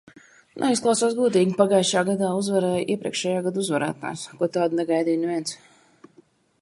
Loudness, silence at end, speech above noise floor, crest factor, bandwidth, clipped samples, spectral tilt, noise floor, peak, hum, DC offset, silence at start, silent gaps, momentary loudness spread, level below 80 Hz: -23 LUFS; 1.05 s; 35 dB; 20 dB; 11.5 kHz; under 0.1%; -4.5 dB/octave; -58 dBFS; -4 dBFS; none; under 0.1%; 0.55 s; none; 9 LU; -68 dBFS